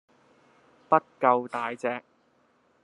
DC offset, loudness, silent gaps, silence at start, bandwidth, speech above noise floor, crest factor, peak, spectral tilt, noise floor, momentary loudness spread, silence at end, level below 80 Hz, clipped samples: under 0.1%; -27 LUFS; none; 0.9 s; 11 kHz; 40 dB; 24 dB; -6 dBFS; -6.5 dB/octave; -66 dBFS; 9 LU; 0.85 s; -84 dBFS; under 0.1%